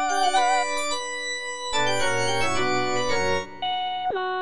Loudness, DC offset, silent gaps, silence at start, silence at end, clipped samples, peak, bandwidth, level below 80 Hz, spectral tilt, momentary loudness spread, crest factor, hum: -24 LUFS; 2%; none; 0 s; 0 s; under 0.1%; -10 dBFS; 10.5 kHz; -52 dBFS; -2.5 dB/octave; 7 LU; 14 dB; none